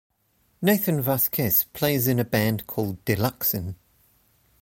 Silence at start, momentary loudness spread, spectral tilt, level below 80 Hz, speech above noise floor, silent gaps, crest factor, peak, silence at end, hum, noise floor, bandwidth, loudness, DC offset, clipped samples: 0.6 s; 8 LU; -5.5 dB/octave; -54 dBFS; 43 dB; none; 18 dB; -6 dBFS; 0.85 s; none; -67 dBFS; 16.5 kHz; -23 LUFS; under 0.1%; under 0.1%